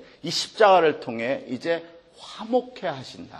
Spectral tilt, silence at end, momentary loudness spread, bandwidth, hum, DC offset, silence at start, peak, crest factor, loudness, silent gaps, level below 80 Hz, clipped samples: -4 dB/octave; 0 s; 16 LU; 12.5 kHz; none; under 0.1%; 0 s; -2 dBFS; 22 dB; -23 LUFS; none; -68 dBFS; under 0.1%